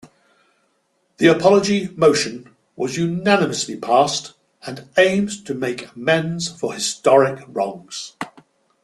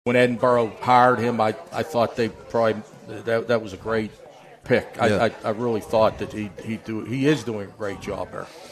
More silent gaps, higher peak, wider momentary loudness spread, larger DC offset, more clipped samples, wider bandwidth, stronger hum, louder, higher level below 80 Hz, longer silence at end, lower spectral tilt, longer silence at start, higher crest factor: neither; about the same, -2 dBFS vs -4 dBFS; first, 17 LU vs 13 LU; neither; neither; second, 12.5 kHz vs 14 kHz; neither; first, -19 LUFS vs -23 LUFS; second, -60 dBFS vs -54 dBFS; first, 0.55 s vs 0 s; second, -4.5 dB/octave vs -6 dB/octave; first, 1.2 s vs 0.05 s; about the same, 18 dB vs 20 dB